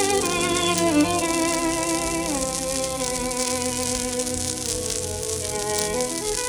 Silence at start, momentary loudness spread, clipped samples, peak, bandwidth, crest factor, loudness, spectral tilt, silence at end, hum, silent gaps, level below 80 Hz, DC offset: 0 s; 5 LU; under 0.1%; -4 dBFS; over 20 kHz; 20 dB; -23 LUFS; -2.5 dB/octave; 0 s; none; none; -44 dBFS; under 0.1%